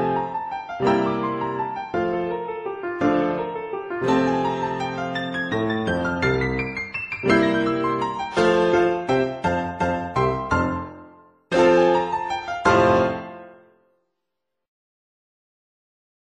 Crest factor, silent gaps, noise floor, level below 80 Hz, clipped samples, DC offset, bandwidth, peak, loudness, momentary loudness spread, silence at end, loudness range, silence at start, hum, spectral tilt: 18 dB; none; -82 dBFS; -48 dBFS; under 0.1%; under 0.1%; 10 kHz; -4 dBFS; -22 LUFS; 11 LU; 2.75 s; 4 LU; 0 s; none; -6.5 dB/octave